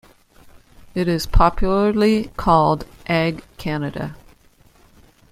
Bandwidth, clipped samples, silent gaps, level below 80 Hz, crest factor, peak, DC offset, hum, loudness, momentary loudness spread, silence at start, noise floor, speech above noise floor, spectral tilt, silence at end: 15.5 kHz; under 0.1%; none; -28 dBFS; 20 dB; 0 dBFS; under 0.1%; none; -20 LUFS; 13 LU; 0.95 s; -53 dBFS; 35 dB; -6.5 dB/octave; 1.15 s